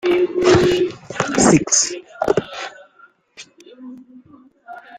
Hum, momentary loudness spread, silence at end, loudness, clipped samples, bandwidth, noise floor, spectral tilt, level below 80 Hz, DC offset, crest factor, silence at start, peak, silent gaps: none; 25 LU; 0 s; -16 LUFS; under 0.1%; 10 kHz; -52 dBFS; -4 dB/octave; -48 dBFS; under 0.1%; 18 dB; 0.05 s; -2 dBFS; none